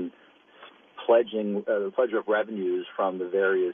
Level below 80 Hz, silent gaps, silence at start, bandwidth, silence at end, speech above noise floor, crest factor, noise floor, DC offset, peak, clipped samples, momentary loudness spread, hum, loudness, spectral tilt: -82 dBFS; none; 0 s; 3.7 kHz; 0 s; 31 dB; 18 dB; -56 dBFS; under 0.1%; -8 dBFS; under 0.1%; 8 LU; none; -26 LUFS; -4 dB/octave